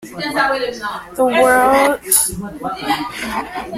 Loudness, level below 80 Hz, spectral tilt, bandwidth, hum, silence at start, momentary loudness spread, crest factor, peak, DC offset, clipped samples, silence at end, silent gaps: -16 LUFS; -44 dBFS; -2 dB/octave; 16.5 kHz; none; 0 s; 13 LU; 16 dB; 0 dBFS; under 0.1%; under 0.1%; 0 s; none